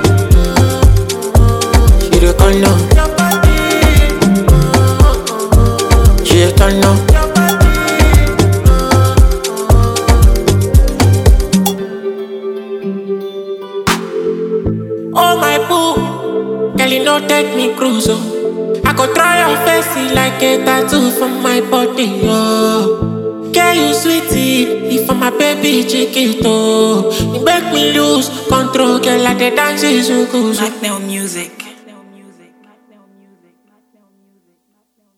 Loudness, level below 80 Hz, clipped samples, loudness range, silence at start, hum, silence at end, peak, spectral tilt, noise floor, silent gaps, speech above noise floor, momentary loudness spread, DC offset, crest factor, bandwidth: -12 LUFS; -16 dBFS; 0.3%; 6 LU; 0 s; none; 3.45 s; 0 dBFS; -5 dB/octave; -62 dBFS; none; 49 dB; 9 LU; under 0.1%; 10 dB; over 20 kHz